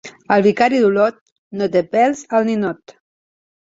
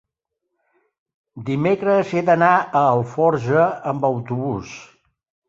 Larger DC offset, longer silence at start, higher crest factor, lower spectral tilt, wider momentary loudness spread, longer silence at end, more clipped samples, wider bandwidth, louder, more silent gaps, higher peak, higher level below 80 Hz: neither; second, 0.05 s vs 1.35 s; about the same, 16 dB vs 18 dB; second, -6 dB/octave vs -7.5 dB/octave; about the same, 10 LU vs 12 LU; first, 0.95 s vs 0.65 s; neither; about the same, 7.8 kHz vs 7.6 kHz; about the same, -17 LUFS vs -19 LUFS; first, 1.21-1.26 s, 1.32-1.51 s vs none; about the same, -2 dBFS vs -2 dBFS; about the same, -60 dBFS vs -58 dBFS